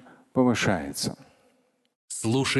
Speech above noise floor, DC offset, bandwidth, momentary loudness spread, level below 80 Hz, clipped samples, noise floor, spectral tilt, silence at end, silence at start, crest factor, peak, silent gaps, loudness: 42 dB; under 0.1%; 12.5 kHz; 12 LU; -54 dBFS; under 0.1%; -67 dBFS; -4.5 dB/octave; 0 s; 0.35 s; 20 dB; -8 dBFS; 1.95-2.08 s; -26 LUFS